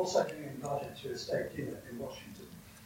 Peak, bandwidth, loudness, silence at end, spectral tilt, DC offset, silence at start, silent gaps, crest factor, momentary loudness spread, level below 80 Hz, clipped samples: -16 dBFS; 16 kHz; -38 LUFS; 0 s; -4.5 dB/octave; under 0.1%; 0 s; none; 22 dB; 15 LU; -66 dBFS; under 0.1%